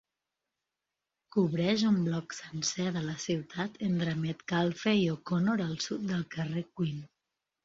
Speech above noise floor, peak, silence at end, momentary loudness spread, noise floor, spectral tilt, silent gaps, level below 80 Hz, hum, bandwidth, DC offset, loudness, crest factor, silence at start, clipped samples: 57 dB; -14 dBFS; 0.6 s; 7 LU; -88 dBFS; -5.5 dB/octave; none; -68 dBFS; none; 7.8 kHz; under 0.1%; -32 LUFS; 18 dB; 1.35 s; under 0.1%